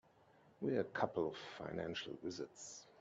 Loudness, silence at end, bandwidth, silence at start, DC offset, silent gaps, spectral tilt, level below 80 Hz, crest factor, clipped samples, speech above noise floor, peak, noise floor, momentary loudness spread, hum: -43 LUFS; 0 s; 8.4 kHz; 0.45 s; under 0.1%; none; -4.5 dB/octave; -76 dBFS; 24 dB; under 0.1%; 26 dB; -20 dBFS; -69 dBFS; 10 LU; none